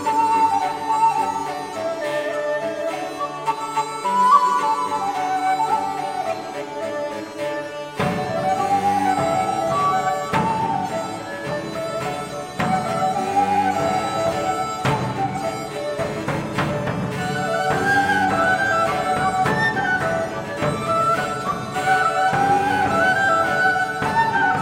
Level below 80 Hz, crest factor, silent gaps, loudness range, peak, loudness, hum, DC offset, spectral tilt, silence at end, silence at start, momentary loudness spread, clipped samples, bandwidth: -52 dBFS; 18 dB; none; 5 LU; -4 dBFS; -21 LUFS; none; under 0.1%; -4.5 dB/octave; 0 s; 0 s; 9 LU; under 0.1%; 16.5 kHz